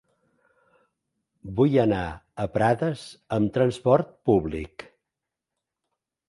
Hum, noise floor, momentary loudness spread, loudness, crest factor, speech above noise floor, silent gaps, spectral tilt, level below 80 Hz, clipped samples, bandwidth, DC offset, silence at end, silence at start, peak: none; -86 dBFS; 15 LU; -24 LUFS; 22 dB; 63 dB; none; -8 dB/octave; -50 dBFS; under 0.1%; 11.5 kHz; under 0.1%; 1.45 s; 1.45 s; -4 dBFS